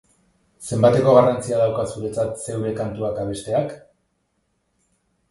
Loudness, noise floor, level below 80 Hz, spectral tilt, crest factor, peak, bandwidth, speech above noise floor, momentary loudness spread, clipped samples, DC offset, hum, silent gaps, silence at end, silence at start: -20 LUFS; -70 dBFS; -52 dBFS; -6.5 dB/octave; 20 dB; -2 dBFS; 11.5 kHz; 50 dB; 13 LU; under 0.1%; under 0.1%; none; none; 1.55 s; 0.6 s